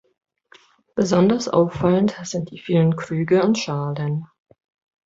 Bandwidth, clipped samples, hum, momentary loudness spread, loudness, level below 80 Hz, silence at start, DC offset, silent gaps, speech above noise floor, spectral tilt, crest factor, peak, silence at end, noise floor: 7.8 kHz; under 0.1%; none; 11 LU; -20 LUFS; -54 dBFS; 0.95 s; under 0.1%; none; 34 dB; -6.5 dB/octave; 18 dB; -4 dBFS; 0.8 s; -53 dBFS